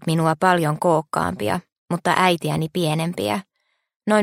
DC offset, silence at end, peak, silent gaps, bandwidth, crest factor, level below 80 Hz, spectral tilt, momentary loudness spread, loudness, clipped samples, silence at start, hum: under 0.1%; 0 s; 0 dBFS; 1.78-1.86 s, 3.96-4.00 s; 16 kHz; 20 dB; -56 dBFS; -5.5 dB/octave; 9 LU; -21 LUFS; under 0.1%; 0 s; none